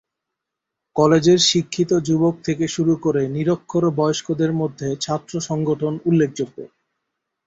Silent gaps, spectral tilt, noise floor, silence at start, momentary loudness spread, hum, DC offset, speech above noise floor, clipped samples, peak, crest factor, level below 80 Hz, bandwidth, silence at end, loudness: none; -5.5 dB/octave; -82 dBFS; 0.95 s; 10 LU; none; under 0.1%; 63 dB; under 0.1%; -2 dBFS; 18 dB; -56 dBFS; 8 kHz; 0.8 s; -20 LUFS